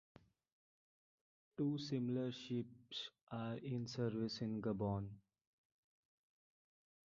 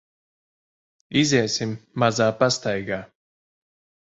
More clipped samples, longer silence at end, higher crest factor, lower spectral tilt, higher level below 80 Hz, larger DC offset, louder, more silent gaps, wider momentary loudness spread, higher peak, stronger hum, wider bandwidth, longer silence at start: neither; first, 2 s vs 1 s; about the same, 18 dB vs 20 dB; first, -6.5 dB/octave vs -4.5 dB/octave; second, -72 dBFS vs -60 dBFS; neither; second, -44 LUFS vs -22 LUFS; first, 3.23-3.27 s vs none; about the same, 8 LU vs 10 LU; second, -28 dBFS vs -4 dBFS; neither; about the same, 7.4 kHz vs 8 kHz; first, 1.6 s vs 1.1 s